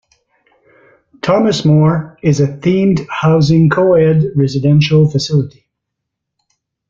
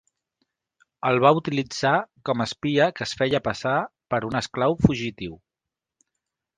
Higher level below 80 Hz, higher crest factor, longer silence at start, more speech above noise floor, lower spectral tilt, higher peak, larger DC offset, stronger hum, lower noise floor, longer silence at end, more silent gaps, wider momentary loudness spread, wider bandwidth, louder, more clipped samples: about the same, -46 dBFS vs -48 dBFS; second, 12 dB vs 24 dB; first, 1.25 s vs 1.05 s; about the same, 65 dB vs 65 dB; first, -7.5 dB/octave vs -5.5 dB/octave; about the same, -2 dBFS vs 0 dBFS; neither; neither; second, -77 dBFS vs -87 dBFS; first, 1.4 s vs 1.2 s; neither; second, 6 LU vs 9 LU; second, 7.4 kHz vs 9.8 kHz; first, -12 LUFS vs -23 LUFS; neither